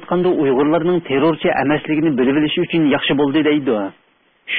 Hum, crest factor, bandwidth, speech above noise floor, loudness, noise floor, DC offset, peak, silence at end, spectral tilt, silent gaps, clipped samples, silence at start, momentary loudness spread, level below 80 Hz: none; 12 dB; 4.7 kHz; 26 dB; -16 LUFS; -42 dBFS; under 0.1%; -4 dBFS; 0 s; -11.5 dB/octave; none; under 0.1%; 0 s; 2 LU; -52 dBFS